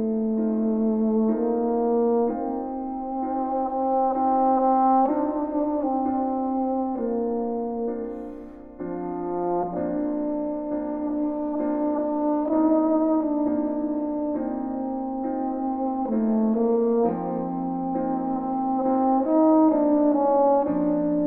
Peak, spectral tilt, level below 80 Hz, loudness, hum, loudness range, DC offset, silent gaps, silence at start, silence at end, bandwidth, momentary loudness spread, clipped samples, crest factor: -8 dBFS; -12.5 dB/octave; -54 dBFS; -24 LUFS; none; 6 LU; under 0.1%; none; 0 s; 0 s; 2.6 kHz; 9 LU; under 0.1%; 14 dB